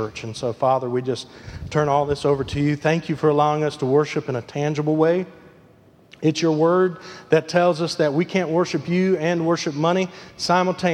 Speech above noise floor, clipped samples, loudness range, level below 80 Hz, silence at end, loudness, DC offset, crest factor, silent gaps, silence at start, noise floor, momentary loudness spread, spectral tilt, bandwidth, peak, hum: 31 dB; under 0.1%; 2 LU; -50 dBFS; 0 s; -21 LUFS; under 0.1%; 18 dB; none; 0 s; -52 dBFS; 9 LU; -6 dB/octave; 11.5 kHz; -2 dBFS; none